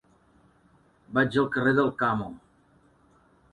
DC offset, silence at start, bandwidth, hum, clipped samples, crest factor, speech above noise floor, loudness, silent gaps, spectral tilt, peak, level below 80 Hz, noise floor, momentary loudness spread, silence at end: under 0.1%; 1.1 s; 11 kHz; none; under 0.1%; 20 dB; 37 dB; -25 LUFS; none; -7.5 dB/octave; -10 dBFS; -60 dBFS; -62 dBFS; 8 LU; 1.15 s